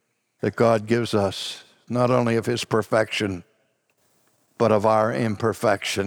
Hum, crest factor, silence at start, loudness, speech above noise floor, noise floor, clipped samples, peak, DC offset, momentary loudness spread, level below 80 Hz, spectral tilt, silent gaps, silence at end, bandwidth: none; 18 dB; 0.45 s; -22 LUFS; 46 dB; -68 dBFS; under 0.1%; -6 dBFS; under 0.1%; 10 LU; -64 dBFS; -5.5 dB/octave; none; 0 s; 18.5 kHz